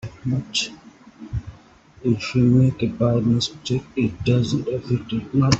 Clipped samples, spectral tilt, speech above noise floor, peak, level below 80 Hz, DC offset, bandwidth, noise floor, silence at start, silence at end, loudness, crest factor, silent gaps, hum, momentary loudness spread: under 0.1%; -6 dB/octave; 29 dB; -2 dBFS; -44 dBFS; under 0.1%; 8.2 kHz; -49 dBFS; 0.05 s; 0 s; -22 LUFS; 20 dB; none; none; 11 LU